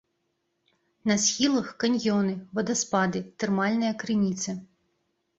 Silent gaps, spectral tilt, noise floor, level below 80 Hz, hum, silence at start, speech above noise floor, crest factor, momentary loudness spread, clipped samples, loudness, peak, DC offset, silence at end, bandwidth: none; -4 dB/octave; -76 dBFS; -66 dBFS; none; 1.05 s; 50 dB; 18 dB; 8 LU; under 0.1%; -26 LUFS; -10 dBFS; under 0.1%; 0.75 s; 8 kHz